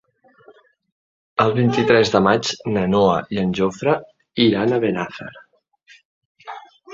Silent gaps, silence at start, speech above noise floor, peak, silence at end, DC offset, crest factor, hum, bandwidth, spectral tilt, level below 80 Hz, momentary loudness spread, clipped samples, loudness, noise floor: 6.05-6.35 s; 1.4 s; 38 dB; -2 dBFS; 0 s; under 0.1%; 18 dB; none; 7.8 kHz; -6 dB/octave; -52 dBFS; 21 LU; under 0.1%; -18 LUFS; -55 dBFS